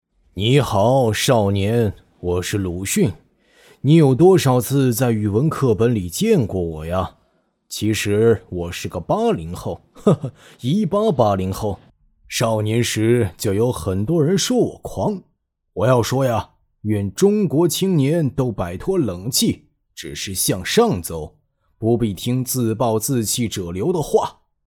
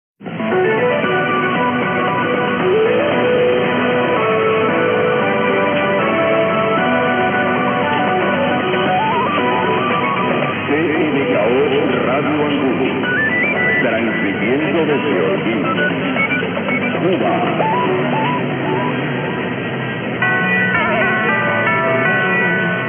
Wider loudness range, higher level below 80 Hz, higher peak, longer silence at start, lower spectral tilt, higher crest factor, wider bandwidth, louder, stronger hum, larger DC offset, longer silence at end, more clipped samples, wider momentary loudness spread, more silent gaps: about the same, 4 LU vs 2 LU; first, -48 dBFS vs -58 dBFS; about the same, -2 dBFS vs -4 dBFS; first, 0.35 s vs 0.2 s; second, -5.5 dB/octave vs -9 dB/octave; about the same, 16 dB vs 12 dB; first, 20 kHz vs 3.8 kHz; second, -19 LUFS vs -16 LUFS; neither; neither; first, 0.4 s vs 0 s; neither; first, 11 LU vs 4 LU; neither